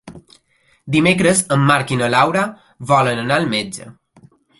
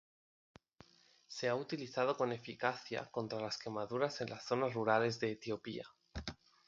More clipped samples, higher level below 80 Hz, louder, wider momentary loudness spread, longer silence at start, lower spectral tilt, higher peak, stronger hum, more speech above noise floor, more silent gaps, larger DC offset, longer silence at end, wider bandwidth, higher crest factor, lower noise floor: neither; first, -52 dBFS vs -64 dBFS; first, -16 LUFS vs -39 LUFS; second, 11 LU vs 14 LU; second, 0.05 s vs 1.3 s; about the same, -4.5 dB/octave vs -5 dB/octave; first, 0 dBFS vs -16 dBFS; neither; first, 43 dB vs 29 dB; neither; neither; first, 0.7 s vs 0.35 s; first, 12 kHz vs 7.8 kHz; second, 18 dB vs 24 dB; second, -59 dBFS vs -67 dBFS